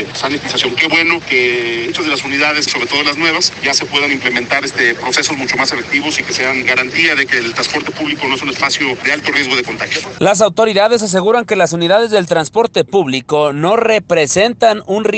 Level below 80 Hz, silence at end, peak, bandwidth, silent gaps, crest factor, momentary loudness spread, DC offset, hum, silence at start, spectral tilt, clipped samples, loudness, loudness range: -52 dBFS; 0 s; 0 dBFS; 9.2 kHz; none; 14 dB; 5 LU; under 0.1%; none; 0 s; -3 dB/octave; under 0.1%; -13 LUFS; 1 LU